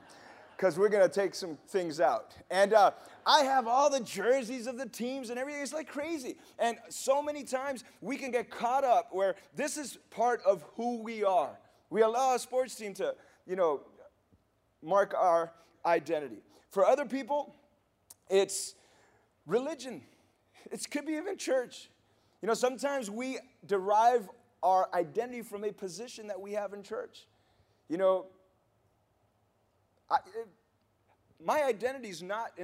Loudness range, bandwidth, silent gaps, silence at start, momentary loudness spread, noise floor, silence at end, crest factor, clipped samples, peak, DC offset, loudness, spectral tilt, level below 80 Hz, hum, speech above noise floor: 9 LU; 16 kHz; none; 0.1 s; 15 LU; -73 dBFS; 0 s; 24 dB; under 0.1%; -8 dBFS; under 0.1%; -31 LUFS; -3.5 dB/octave; -80 dBFS; none; 42 dB